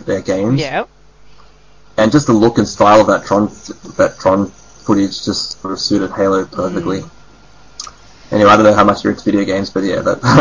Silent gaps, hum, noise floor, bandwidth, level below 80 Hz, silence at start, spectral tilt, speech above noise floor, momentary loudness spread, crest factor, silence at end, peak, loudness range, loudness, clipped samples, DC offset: none; none; -46 dBFS; 7.6 kHz; -42 dBFS; 0.05 s; -5.5 dB/octave; 33 dB; 15 LU; 14 dB; 0 s; 0 dBFS; 5 LU; -13 LUFS; under 0.1%; 0.6%